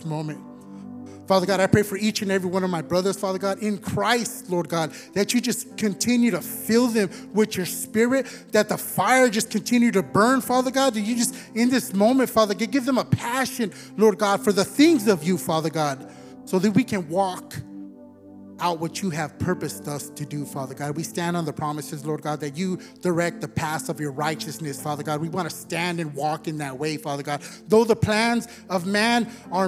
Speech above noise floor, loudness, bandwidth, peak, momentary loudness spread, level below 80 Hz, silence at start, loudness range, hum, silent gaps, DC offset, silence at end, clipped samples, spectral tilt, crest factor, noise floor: 22 dB; -23 LUFS; 16.5 kHz; -2 dBFS; 11 LU; -62 dBFS; 0 s; 8 LU; none; none; under 0.1%; 0 s; under 0.1%; -4.5 dB/octave; 20 dB; -45 dBFS